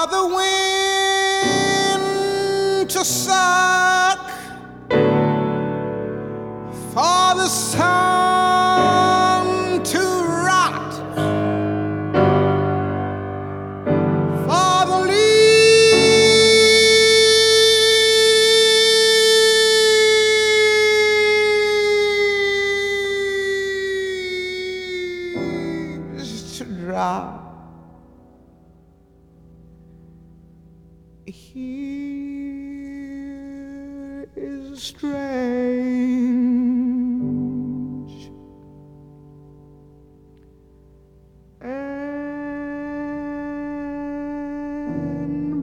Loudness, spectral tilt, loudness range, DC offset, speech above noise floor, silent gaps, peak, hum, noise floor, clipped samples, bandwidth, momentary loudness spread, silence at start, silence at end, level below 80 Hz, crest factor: -16 LUFS; -3 dB/octave; 20 LU; under 0.1%; 34 dB; none; -4 dBFS; none; -51 dBFS; under 0.1%; 17 kHz; 20 LU; 0 s; 0 s; -52 dBFS; 16 dB